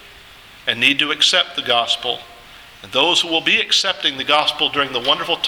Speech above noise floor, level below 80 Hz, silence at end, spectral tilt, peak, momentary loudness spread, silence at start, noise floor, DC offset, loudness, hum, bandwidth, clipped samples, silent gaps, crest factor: 24 dB; -56 dBFS; 0 s; -1 dB/octave; 0 dBFS; 8 LU; 0.05 s; -42 dBFS; under 0.1%; -16 LUFS; none; over 20 kHz; under 0.1%; none; 18 dB